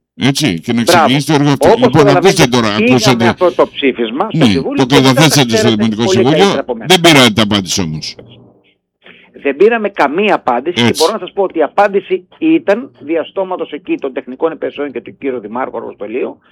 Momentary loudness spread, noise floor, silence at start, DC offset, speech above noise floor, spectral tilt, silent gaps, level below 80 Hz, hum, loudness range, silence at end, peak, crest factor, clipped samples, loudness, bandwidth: 12 LU; -54 dBFS; 0.2 s; under 0.1%; 42 dB; -4.5 dB/octave; none; -46 dBFS; none; 8 LU; 0.2 s; 0 dBFS; 12 dB; under 0.1%; -11 LUFS; 19 kHz